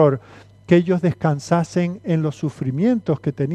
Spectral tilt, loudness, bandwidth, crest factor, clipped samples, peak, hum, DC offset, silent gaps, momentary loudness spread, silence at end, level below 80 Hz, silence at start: -8 dB/octave; -20 LUFS; 9.2 kHz; 18 dB; under 0.1%; -2 dBFS; none; under 0.1%; none; 7 LU; 0 s; -56 dBFS; 0 s